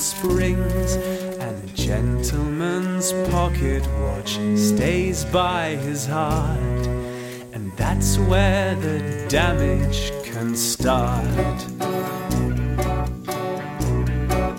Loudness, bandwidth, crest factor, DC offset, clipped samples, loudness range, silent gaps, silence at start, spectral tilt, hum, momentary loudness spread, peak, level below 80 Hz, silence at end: -22 LUFS; 17 kHz; 18 dB; under 0.1%; under 0.1%; 2 LU; none; 0 s; -5 dB/octave; none; 8 LU; -4 dBFS; -28 dBFS; 0 s